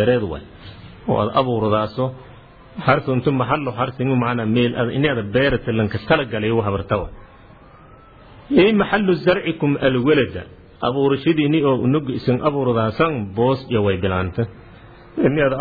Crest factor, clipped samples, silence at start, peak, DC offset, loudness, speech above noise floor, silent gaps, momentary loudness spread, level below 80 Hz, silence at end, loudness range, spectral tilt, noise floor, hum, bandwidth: 16 dB; under 0.1%; 0 s; -2 dBFS; under 0.1%; -19 LUFS; 26 dB; none; 9 LU; -44 dBFS; 0 s; 3 LU; -10 dB/octave; -45 dBFS; none; 4.9 kHz